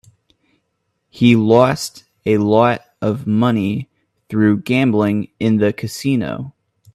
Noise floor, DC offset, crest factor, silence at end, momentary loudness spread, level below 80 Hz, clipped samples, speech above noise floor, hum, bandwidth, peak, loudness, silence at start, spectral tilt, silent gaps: -70 dBFS; under 0.1%; 16 dB; 0.45 s; 12 LU; -54 dBFS; under 0.1%; 55 dB; none; 13.5 kHz; 0 dBFS; -16 LUFS; 1.15 s; -6.5 dB/octave; none